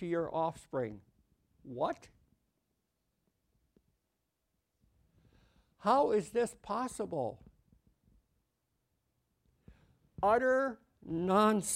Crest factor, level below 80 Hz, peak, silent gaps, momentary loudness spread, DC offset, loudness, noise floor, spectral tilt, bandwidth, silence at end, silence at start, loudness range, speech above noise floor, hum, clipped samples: 22 dB; -68 dBFS; -14 dBFS; none; 13 LU; under 0.1%; -33 LUFS; -84 dBFS; -5 dB/octave; 16 kHz; 0 s; 0 s; 10 LU; 51 dB; none; under 0.1%